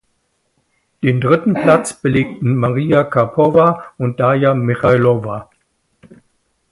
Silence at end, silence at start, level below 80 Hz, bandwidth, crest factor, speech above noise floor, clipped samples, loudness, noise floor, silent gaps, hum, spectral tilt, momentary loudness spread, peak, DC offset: 1.3 s; 1 s; -48 dBFS; 11.5 kHz; 16 dB; 51 dB; under 0.1%; -14 LUFS; -65 dBFS; none; none; -7.5 dB/octave; 8 LU; 0 dBFS; under 0.1%